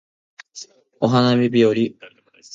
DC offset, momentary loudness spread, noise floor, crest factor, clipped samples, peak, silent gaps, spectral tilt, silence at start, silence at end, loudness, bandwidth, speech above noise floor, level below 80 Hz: under 0.1%; 22 LU; -42 dBFS; 18 dB; under 0.1%; -2 dBFS; none; -6.5 dB/octave; 0.55 s; 0.5 s; -18 LUFS; 7.6 kHz; 25 dB; -64 dBFS